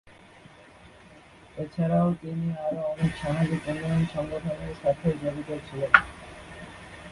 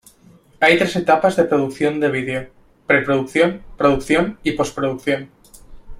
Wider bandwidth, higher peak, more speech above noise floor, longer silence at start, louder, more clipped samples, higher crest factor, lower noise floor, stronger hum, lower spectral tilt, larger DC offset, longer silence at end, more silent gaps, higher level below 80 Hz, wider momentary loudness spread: second, 11.5 kHz vs 16 kHz; about the same, -2 dBFS vs -2 dBFS; second, 25 dB vs 32 dB; second, 0.05 s vs 0.6 s; second, -27 LUFS vs -18 LUFS; neither; first, 28 dB vs 18 dB; about the same, -51 dBFS vs -50 dBFS; neither; first, -7.5 dB/octave vs -5.5 dB/octave; neither; about the same, 0 s vs 0 s; neither; second, -52 dBFS vs -44 dBFS; first, 22 LU vs 8 LU